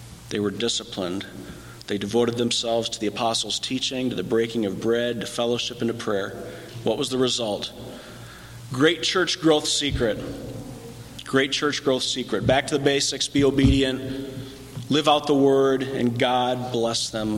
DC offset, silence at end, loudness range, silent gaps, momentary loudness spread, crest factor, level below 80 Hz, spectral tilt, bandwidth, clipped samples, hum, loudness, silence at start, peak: under 0.1%; 0 s; 4 LU; none; 18 LU; 18 dB; -42 dBFS; -4 dB/octave; 16.5 kHz; under 0.1%; none; -23 LUFS; 0 s; -6 dBFS